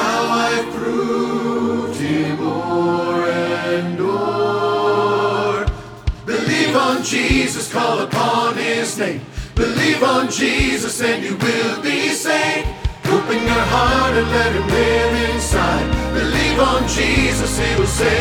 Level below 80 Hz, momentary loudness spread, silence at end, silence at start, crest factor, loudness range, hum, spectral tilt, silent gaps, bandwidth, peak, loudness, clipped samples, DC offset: -30 dBFS; 6 LU; 0 s; 0 s; 16 dB; 3 LU; none; -4.5 dB/octave; none; 19.5 kHz; -2 dBFS; -17 LUFS; under 0.1%; under 0.1%